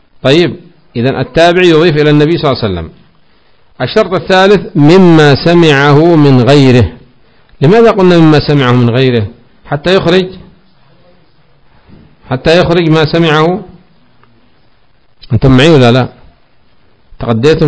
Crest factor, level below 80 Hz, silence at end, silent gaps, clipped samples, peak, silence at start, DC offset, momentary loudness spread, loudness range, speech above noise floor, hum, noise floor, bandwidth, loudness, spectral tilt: 8 dB; -32 dBFS; 0 s; none; 6%; 0 dBFS; 0.25 s; under 0.1%; 12 LU; 7 LU; 44 dB; none; -51 dBFS; 8 kHz; -7 LUFS; -7 dB/octave